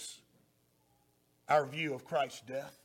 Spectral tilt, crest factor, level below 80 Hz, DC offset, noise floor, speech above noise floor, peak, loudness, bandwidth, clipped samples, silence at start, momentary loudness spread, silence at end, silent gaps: -4 dB/octave; 24 dB; -82 dBFS; under 0.1%; -72 dBFS; 38 dB; -14 dBFS; -35 LUFS; 17 kHz; under 0.1%; 0 s; 14 LU; 0.1 s; none